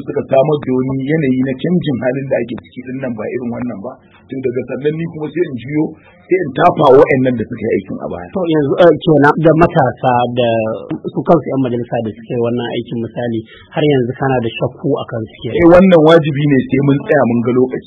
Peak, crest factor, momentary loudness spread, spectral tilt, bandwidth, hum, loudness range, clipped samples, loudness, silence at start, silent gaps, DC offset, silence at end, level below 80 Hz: 0 dBFS; 14 dB; 14 LU; -9 dB/octave; 7 kHz; none; 9 LU; 0.2%; -14 LUFS; 0 s; none; under 0.1%; 0.05 s; -44 dBFS